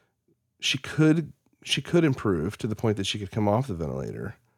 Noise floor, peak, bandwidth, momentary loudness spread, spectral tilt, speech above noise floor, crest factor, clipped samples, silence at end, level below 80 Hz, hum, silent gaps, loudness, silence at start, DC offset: -71 dBFS; -10 dBFS; 14 kHz; 11 LU; -5.5 dB/octave; 46 dB; 18 dB; under 0.1%; 0.25 s; -52 dBFS; none; none; -26 LUFS; 0.6 s; under 0.1%